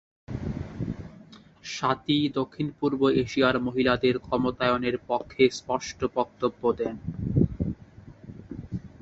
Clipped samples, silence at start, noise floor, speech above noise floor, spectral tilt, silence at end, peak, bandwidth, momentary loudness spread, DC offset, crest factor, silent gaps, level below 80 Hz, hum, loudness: under 0.1%; 0.3 s; -50 dBFS; 25 dB; -6 dB/octave; 0.15 s; -8 dBFS; 8 kHz; 16 LU; under 0.1%; 20 dB; none; -46 dBFS; none; -27 LUFS